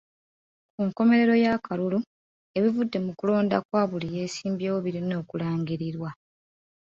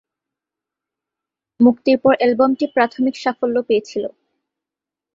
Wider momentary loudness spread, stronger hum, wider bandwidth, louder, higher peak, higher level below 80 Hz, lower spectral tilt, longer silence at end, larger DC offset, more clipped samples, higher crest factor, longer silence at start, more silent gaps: first, 11 LU vs 8 LU; neither; about the same, 7.6 kHz vs 7.6 kHz; second, -26 LUFS vs -17 LUFS; second, -10 dBFS vs -2 dBFS; second, -66 dBFS vs -60 dBFS; about the same, -7 dB/octave vs -6 dB/octave; second, 0.8 s vs 1.05 s; neither; neither; about the same, 16 dB vs 18 dB; second, 0.8 s vs 1.6 s; first, 2.07-2.54 s, 3.65-3.69 s vs none